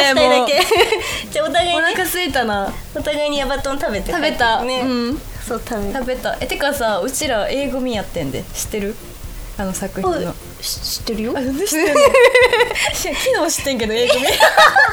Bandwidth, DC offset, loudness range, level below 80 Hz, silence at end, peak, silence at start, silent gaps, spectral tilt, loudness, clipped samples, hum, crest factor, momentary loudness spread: over 20 kHz; under 0.1%; 9 LU; -36 dBFS; 0 s; 0 dBFS; 0 s; none; -2.5 dB/octave; -16 LUFS; under 0.1%; none; 16 dB; 13 LU